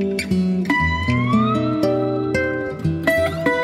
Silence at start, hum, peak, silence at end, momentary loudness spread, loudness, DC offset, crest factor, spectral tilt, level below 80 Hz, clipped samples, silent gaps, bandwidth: 0 s; none; -4 dBFS; 0 s; 3 LU; -19 LUFS; under 0.1%; 14 dB; -6.5 dB/octave; -38 dBFS; under 0.1%; none; 16 kHz